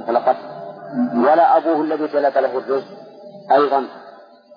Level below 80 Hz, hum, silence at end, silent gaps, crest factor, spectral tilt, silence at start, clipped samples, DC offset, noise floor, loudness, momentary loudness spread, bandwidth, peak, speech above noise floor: -82 dBFS; none; 0.4 s; none; 14 dB; -7.5 dB/octave; 0 s; under 0.1%; under 0.1%; -43 dBFS; -18 LUFS; 19 LU; 5.2 kHz; -4 dBFS; 25 dB